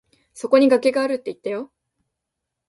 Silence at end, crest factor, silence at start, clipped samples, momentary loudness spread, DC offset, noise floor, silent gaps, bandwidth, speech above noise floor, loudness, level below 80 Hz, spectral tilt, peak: 1.05 s; 20 dB; 0.35 s; under 0.1%; 17 LU; under 0.1%; -82 dBFS; none; 11.5 kHz; 63 dB; -19 LUFS; -70 dBFS; -4.5 dB/octave; -2 dBFS